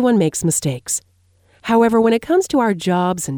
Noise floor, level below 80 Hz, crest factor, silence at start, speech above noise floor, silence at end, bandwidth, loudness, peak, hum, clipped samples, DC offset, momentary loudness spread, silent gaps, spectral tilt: -56 dBFS; -52 dBFS; 14 dB; 0 s; 39 dB; 0 s; 19.5 kHz; -17 LUFS; -2 dBFS; none; under 0.1%; under 0.1%; 8 LU; none; -5 dB/octave